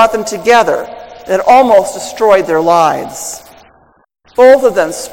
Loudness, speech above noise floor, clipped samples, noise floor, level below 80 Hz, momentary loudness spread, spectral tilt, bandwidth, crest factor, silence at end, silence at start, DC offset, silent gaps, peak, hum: -10 LUFS; 38 dB; 2%; -48 dBFS; -48 dBFS; 16 LU; -3.5 dB/octave; 17 kHz; 10 dB; 0 s; 0 s; under 0.1%; none; 0 dBFS; none